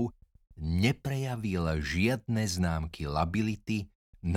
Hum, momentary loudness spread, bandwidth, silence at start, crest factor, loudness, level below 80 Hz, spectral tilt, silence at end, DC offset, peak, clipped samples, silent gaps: none; 7 LU; 16 kHz; 0 s; 20 dB; -31 LUFS; -44 dBFS; -6 dB/octave; 0 s; under 0.1%; -12 dBFS; under 0.1%; 3.95-4.13 s